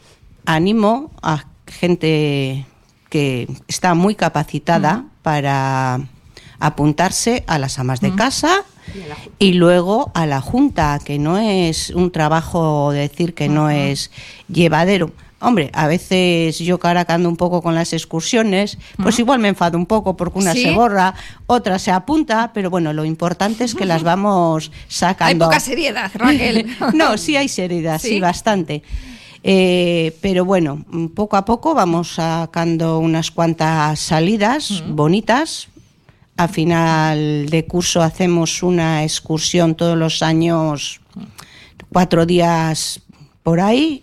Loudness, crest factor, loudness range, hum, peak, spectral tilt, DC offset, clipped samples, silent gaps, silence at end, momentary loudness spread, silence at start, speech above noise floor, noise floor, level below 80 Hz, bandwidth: -16 LUFS; 16 dB; 2 LU; none; 0 dBFS; -5 dB/octave; under 0.1%; under 0.1%; none; 0.05 s; 9 LU; 0.45 s; 35 dB; -51 dBFS; -42 dBFS; 14.5 kHz